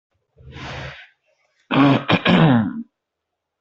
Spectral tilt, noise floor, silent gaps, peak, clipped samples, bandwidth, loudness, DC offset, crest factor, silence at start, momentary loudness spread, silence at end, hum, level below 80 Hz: -8 dB/octave; -80 dBFS; none; -2 dBFS; under 0.1%; 7.6 kHz; -16 LUFS; under 0.1%; 20 dB; 0.45 s; 20 LU; 0.75 s; none; -50 dBFS